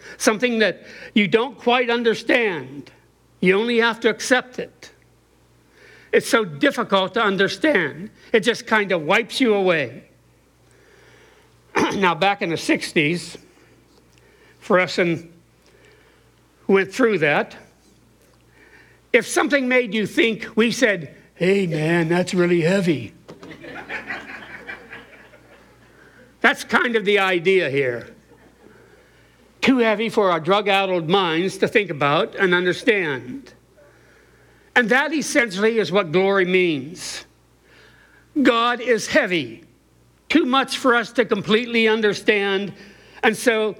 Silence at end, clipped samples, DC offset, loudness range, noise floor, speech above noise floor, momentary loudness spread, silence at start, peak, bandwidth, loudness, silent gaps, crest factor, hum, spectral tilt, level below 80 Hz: 0.05 s; under 0.1%; under 0.1%; 4 LU; -56 dBFS; 37 dB; 14 LU; 0.05 s; -2 dBFS; 17.5 kHz; -19 LUFS; none; 18 dB; none; -4.5 dB/octave; -60 dBFS